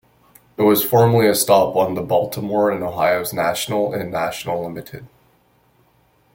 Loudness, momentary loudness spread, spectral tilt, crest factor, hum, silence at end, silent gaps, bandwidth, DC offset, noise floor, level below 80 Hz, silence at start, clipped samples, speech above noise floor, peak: -18 LUFS; 13 LU; -5 dB/octave; 18 dB; none; 1.3 s; none; 17 kHz; under 0.1%; -58 dBFS; -56 dBFS; 0.6 s; under 0.1%; 40 dB; -2 dBFS